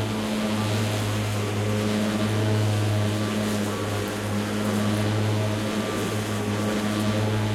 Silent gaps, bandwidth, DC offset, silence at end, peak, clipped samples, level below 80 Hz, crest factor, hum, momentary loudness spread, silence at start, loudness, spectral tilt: none; 15.5 kHz; under 0.1%; 0 s; -12 dBFS; under 0.1%; -48 dBFS; 12 dB; none; 3 LU; 0 s; -25 LUFS; -5.5 dB/octave